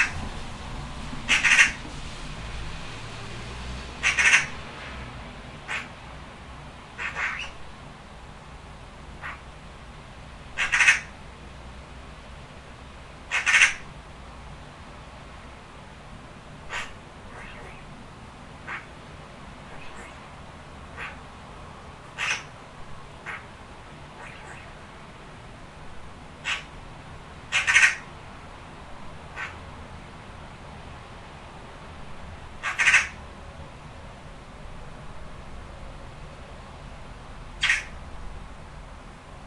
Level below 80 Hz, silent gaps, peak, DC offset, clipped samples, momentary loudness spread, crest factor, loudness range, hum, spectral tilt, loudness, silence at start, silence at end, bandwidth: -46 dBFS; none; -2 dBFS; under 0.1%; under 0.1%; 25 LU; 28 dB; 17 LU; none; -1.5 dB/octave; -24 LUFS; 0 s; 0 s; 12 kHz